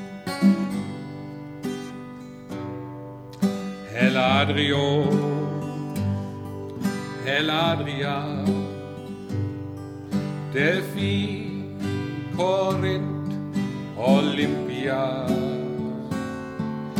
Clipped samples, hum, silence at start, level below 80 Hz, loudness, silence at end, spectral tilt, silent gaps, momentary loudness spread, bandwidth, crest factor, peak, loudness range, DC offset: under 0.1%; 50 Hz at -45 dBFS; 0 s; -60 dBFS; -25 LUFS; 0 s; -6.5 dB/octave; none; 15 LU; 15.5 kHz; 20 dB; -6 dBFS; 4 LU; under 0.1%